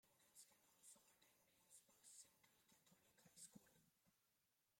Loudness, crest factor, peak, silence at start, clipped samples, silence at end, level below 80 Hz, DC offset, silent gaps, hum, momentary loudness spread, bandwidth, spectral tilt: -66 LUFS; 24 dB; -50 dBFS; 0.05 s; under 0.1%; 0 s; under -90 dBFS; under 0.1%; none; none; 4 LU; 16.5 kHz; -1.5 dB/octave